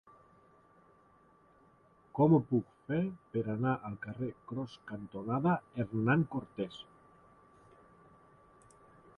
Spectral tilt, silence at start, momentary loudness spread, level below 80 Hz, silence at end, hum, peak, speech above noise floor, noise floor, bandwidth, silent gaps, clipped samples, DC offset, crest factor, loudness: -9.5 dB/octave; 2.15 s; 15 LU; -68 dBFS; 2.35 s; none; -14 dBFS; 32 dB; -65 dBFS; 9.2 kHz; none; under 0.1%; under 0.1%; 22 dB; -34 LUFS